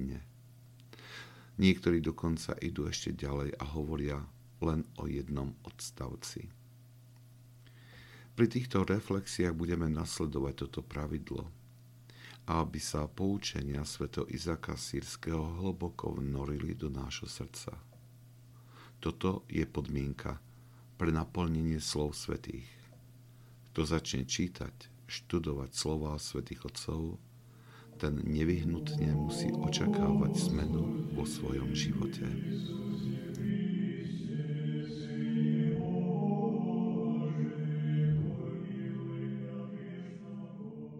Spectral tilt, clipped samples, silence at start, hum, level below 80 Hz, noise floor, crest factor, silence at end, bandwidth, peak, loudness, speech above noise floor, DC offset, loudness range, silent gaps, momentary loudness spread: -6 dB/octave; under 0.1%; 0 s; none; -50 dBFS; -57 dBFS; 24 dB; 0 s; 15.5 kHz; -12 dBFS; -35 LUFS; 22 dB; under 0.1%; 7 LU; none; 14 LU